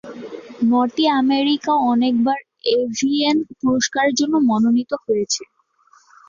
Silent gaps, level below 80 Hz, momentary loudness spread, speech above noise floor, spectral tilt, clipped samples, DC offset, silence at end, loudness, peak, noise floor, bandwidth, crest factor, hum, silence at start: none; -62 dBFS; 6 LU; 38 dB; -3.5 dB/octave; under 0.1%; under 0.1%; 0.85 s; -18 LUFS; -6 dBFS; -56 dBFS; 7.4 kHz; 14 dB; none; 0.05 s